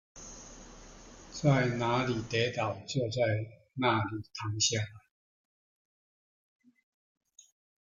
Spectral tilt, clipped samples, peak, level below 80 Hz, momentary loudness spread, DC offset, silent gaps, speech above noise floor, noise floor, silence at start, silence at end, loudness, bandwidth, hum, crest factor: -4.5 dB/octave; under 0.1%; -14 dBFS; -60 dBFS; 21 LU; under 0.1%; none; 21 dB; -52 dBFS; 0.15 s; 2.8 s; -31 LUFS; 9.4 kHz; none; 20 dB